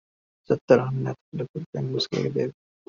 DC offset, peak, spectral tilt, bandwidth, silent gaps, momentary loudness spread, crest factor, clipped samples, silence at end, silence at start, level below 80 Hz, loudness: under 0.1%; -4 dBFS; -5.5 dB/octave; 7.4 kHz; 0.61-0.68 s, 1.21-1.32 s, 1.49-1.54 s, 1.66-1.73 s; 13 LU; 22 dB; under 0.1%; 0.35 s; 0.5 s; -62 dBFS; -26 LUFS